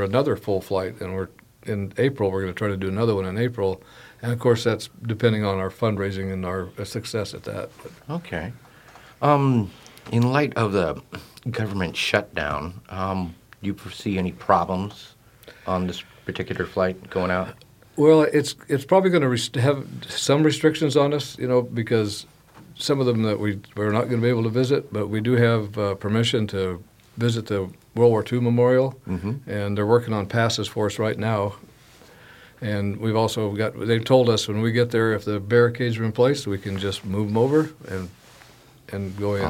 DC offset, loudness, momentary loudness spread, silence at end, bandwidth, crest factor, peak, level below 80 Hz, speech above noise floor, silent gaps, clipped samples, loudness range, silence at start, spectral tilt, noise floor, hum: under 0.1%; -23 LUFS; 13 LU; 0 s; 16 kHz; 22 dB; -2 dBFS; -54 dBFS; 28 dB; none; under 0.1%; 6 LU; 0 s; -6 dB/octave; -50 dBFS; none